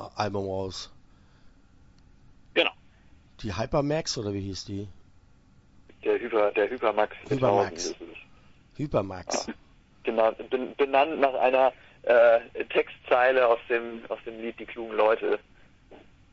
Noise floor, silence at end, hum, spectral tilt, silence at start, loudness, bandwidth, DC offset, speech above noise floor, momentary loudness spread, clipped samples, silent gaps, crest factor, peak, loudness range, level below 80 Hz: -57 dBFS; 0.35 s; none; -4.5 dB/octave; 0 s; -26 LUFS; 8 kHz; under 0.1%; 31 dB; 15 LU; under 0.1%; none; 20 dB; -6 dBFS; 9 LU; -56 dBFS